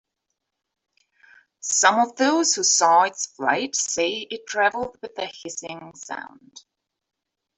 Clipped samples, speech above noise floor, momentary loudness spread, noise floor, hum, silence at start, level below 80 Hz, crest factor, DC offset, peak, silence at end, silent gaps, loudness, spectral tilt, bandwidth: under 0.1%; 58 dB; 17 LU; -80 dBFS; none; 1.65 s; -70 dBFS; 22 dB; under 0.1%; -2 dBFS; 1 s; none; -21 LUFS; -0.5 dB/octave; 8.4 kHz